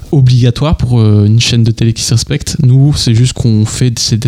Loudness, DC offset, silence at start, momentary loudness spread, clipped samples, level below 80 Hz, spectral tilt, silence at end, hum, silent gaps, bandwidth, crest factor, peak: -9 LUFS; under 0.1%; 0 s; 4 LU; under 0.1%; -26 dBFS; -5.5 dB/octave; 0 s; none; none; 13 kHz; 8 dB; 0 dBFS